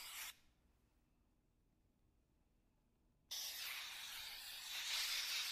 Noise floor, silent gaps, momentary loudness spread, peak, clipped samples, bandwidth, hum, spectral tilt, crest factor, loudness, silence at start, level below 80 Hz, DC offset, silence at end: -79 dBFS; none; 10 LU; -30 dBFS; under 0.1%; 15 kHz; none; 3 dB/octave; 20 dB; -45 LUFS; 0 s; -78 dBFS; under 0.1%; 0 s